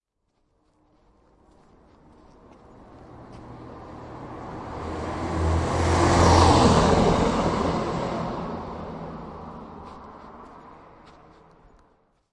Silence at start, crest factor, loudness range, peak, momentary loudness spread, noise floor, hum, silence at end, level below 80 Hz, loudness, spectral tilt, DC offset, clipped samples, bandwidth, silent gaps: 2.8 s; 22 dB; 22 LU; -4 dBFS; 26 LU; -72 dBFS; none; 1.6 s; -40 dBFS; -22 LUFS; -5.5 dB/octave; under 0.1%; under 0.1%; 11 kHz; none